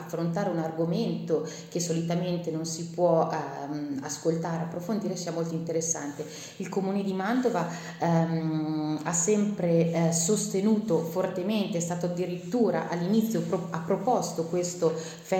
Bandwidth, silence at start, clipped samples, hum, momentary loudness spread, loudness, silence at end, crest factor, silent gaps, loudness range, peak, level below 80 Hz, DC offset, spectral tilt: 16.5 kHz; 0 s; under 0.1%; none; 8 LU; -28 LUFS; 0 s; 18 dB; none; 4 LU; -10 dBFS; -70 dBFS; under 0.1%; -5.5 dB/octave